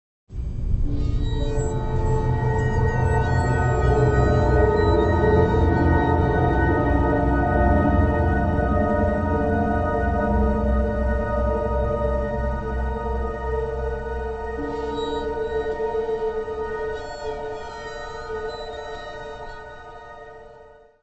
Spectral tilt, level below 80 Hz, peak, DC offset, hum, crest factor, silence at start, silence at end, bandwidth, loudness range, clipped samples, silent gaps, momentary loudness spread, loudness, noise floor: -8 dB/octave; -28 dBFS; -4 dBFS; under 0.1%; none; 16 dB; 0.3 s; 0.3 s; 8.4 kHz; 11 LU; under 0.1%; none; 14 LU; -23 LUFS; -48 dBFS